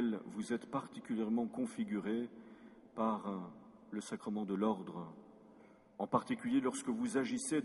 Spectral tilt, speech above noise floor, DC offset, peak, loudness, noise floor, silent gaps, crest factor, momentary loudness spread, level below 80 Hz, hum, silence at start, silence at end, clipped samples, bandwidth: -5.5 dB/octave; 24 dB; under 0.1%; -16 dBFS; -39 LUFS; -62 dBFS; none; 22 dB; 16 LU; -78 dBFS; none; 0 s; 0 s; under 0.1%; 11.5 kHz